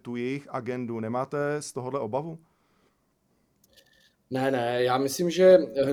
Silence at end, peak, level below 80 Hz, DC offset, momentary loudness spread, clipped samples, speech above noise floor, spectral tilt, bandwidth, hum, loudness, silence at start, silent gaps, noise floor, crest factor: 0 s; -6 dBFS; -68 dBFS; under 0.1%; 15 LU; under 0.1%; 45 dB; -5.5 dB/octave; 19.5 kHz; none; -26 LUFS; 0.05 s; none; -70 dBFS; 20 dB